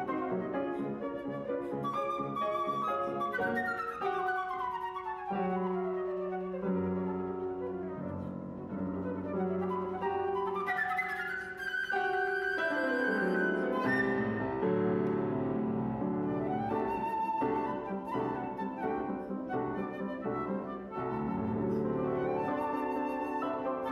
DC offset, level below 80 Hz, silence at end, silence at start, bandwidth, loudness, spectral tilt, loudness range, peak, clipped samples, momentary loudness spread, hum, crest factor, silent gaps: under 0.1%; -62 dBFS; 0 s; 0 s; 13 kHz; -34 LUFS; -8 dB/octave; 5 LU; -18 dBFS; under 0.1%; 7 LU; none; 14 dB; none